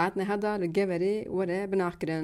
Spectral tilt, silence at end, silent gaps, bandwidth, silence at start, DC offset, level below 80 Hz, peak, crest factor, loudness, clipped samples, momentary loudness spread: -7 dB/octave; 0 s; none; 12.5 kHz; 0 s; under 0.1%; -60 dBFS; -14 dBFS; 16 dB; -29 LUFS; under 0.1%; 2 LU